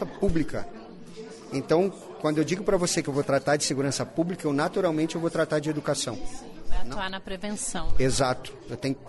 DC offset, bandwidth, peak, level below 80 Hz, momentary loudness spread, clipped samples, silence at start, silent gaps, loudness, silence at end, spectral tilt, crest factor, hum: under 0.1%; 11.5 kHz; -12 dBFS; -40 dBFS; 14 LU; under 0.1%; 0 s; none; -27 LUFS; 0 s; -4.5 dB/octave; 14 dB; none